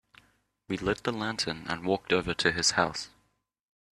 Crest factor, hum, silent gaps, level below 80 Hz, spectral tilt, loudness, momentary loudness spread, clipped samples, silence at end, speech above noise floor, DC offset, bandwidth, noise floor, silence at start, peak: 22 dB; none; none; -58 dBFS; -3 dB/octave; -29 LUFS; 10 LU; under 0.1%; 0.9 s; 43 dB; under 0.1%; 13.5 kHz; -72 dBFS; 0.7 s; -8 dBFS